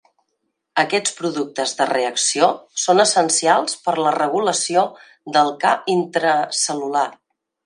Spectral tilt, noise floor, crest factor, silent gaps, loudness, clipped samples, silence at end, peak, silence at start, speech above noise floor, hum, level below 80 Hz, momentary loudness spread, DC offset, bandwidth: -2 dB/octave; -74 dBFS; 18 dB; none; -18 LUFS; under 0.1%; 0.55 s; 0 dBFS; 0.75 s; 55 dB; none; -74 dBFS; 8 LU; under 0.1%; 11.5 kHz